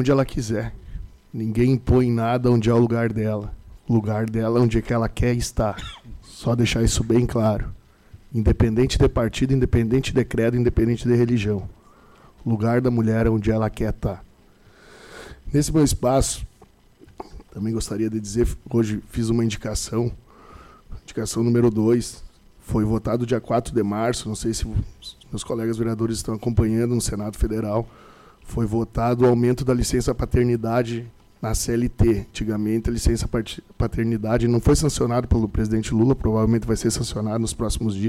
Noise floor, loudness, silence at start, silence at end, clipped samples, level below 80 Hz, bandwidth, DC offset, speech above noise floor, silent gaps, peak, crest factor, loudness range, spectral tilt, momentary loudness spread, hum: -53 dBFS; -22 LUFS; 0 s; 0 s; under 0.1%; -34 dBFS; 15 kHz; under 0.1%; 32 dB; none; -10 dBFS; 12 dB; 4 LU; -6.5 dB/octave; 13 LU; none